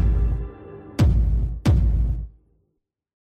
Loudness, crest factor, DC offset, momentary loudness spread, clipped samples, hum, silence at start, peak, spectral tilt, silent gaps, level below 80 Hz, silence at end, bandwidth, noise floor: -23 LUFS; 14 dB; under 0.1%; 16 LU; under 0.1%; none; 0 s; -8 dBFS; -8 dB/octave; none; -24 dBFS; 1 s; 8.2 kHz; -75 dBFS